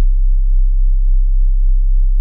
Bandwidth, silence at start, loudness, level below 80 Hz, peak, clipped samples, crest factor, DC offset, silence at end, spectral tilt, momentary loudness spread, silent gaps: 0.1 kHz; 0 s; -18 LUFS; -10 dBFS; -6 dBFS; under 0.1%; 4 dB; under 0.1%; 0 s; -17.5 dB/octave; 0 LU; none